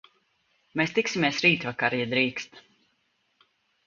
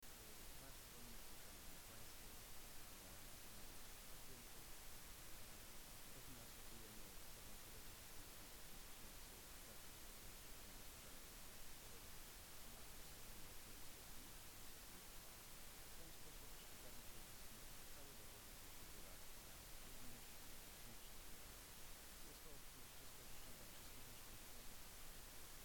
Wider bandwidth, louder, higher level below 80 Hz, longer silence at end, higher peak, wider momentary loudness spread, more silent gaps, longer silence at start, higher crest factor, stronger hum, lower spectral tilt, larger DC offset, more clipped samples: second, 7.6 kHz vs over 20 kHz; first, -25 LUFS vs -58 LUFS; about the same, -68 dBFS vs -64 dBFS; first, 1.25 s vs 0 s; first, -6 dBFS vs -42 dBFS; first, 13 LU vs 0 LU; neither; first, 0.75 s vs 0 s; first, 22 dB vs 14 dB; neither; first, -4.5 dB/octave vs -2 dB/octave; neither; neither